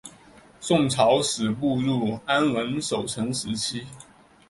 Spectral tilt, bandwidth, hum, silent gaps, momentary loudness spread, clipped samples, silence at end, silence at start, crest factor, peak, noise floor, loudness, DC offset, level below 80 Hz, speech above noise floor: -4.5 dB/octave; 11.5 kHz; none; none; 12 LU; under 0.1%; 0.45 s; 0.05 s; 18 dB; -6 dBFS; -51 dBFS; -24 LUFS; under 0.1%; -58 dBFS; 27 dB